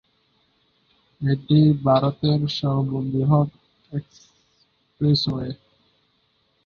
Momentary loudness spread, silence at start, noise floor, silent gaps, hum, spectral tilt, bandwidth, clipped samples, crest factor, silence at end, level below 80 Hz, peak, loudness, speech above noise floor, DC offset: 16 LU; 1.2 s; -66 dBFS; none; none; -8.5 dB/octave; 6.8 kHz; under 0.1%; 18 dB; 1.1 s; -54 dBFS; -6 dBFS; -22 LUFS; 46 dB; under 0.1%